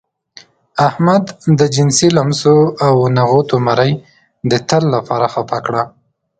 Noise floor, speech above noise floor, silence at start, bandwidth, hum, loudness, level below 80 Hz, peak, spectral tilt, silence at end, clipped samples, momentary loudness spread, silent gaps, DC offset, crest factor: -43 dBFS; 31 dB; 0.75 s; 9.4 kHz; none; -13 LUFS; -50 dBFS; 0 dBFS; -5.5 dB/octave; 0.5 s; under 0.1%; 8 LU; none; under 0.1%; 14 dB